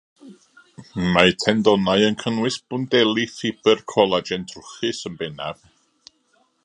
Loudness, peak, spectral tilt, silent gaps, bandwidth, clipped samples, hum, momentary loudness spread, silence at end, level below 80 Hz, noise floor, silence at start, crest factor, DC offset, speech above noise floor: -20 LUFS; 0 dBFS; -4.5 dB/octave; none; 11 kHz; under 0.1%; none; 14 LU; 1.1 s; -52 dBFS; -64 dBFS; 0.25 s; 22 dB; under 0.1%; 43 dB